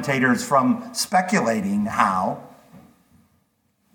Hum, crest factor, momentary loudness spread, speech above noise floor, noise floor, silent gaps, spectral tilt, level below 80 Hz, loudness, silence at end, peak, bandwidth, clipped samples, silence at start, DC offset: none; 20 dB; 5 LU; 46 dB; -67 dBFS; none; -4.5 dB/octave; -64 dBFS; -21 LUFS; 1.15 s; -2 dBFS; 18.5 kHz; under 0.1%; 0 s; under 0.1%